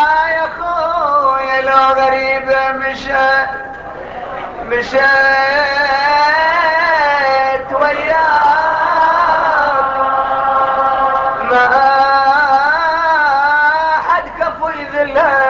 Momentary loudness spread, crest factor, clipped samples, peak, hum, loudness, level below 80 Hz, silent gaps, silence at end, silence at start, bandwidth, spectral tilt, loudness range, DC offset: 8 LU; 12 dB; under 0.1%; 0 dBFS; none; -12 LUFS; -44 dBFS; none; 0 s; 0 s; 7.4 kHz; -3.5 dB/octave; 3 LU; under 0.1%